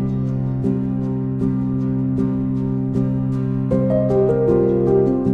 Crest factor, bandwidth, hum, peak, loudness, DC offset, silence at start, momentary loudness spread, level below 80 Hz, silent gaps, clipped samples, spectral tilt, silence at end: 12 dB; 3.4 kHz; none; -6 dBFS; -19 LUFS; under 0.1%; 0 s; 5 LU; -38 dBFS; none; under 0.1%; -11.5 dB/octave; 0 s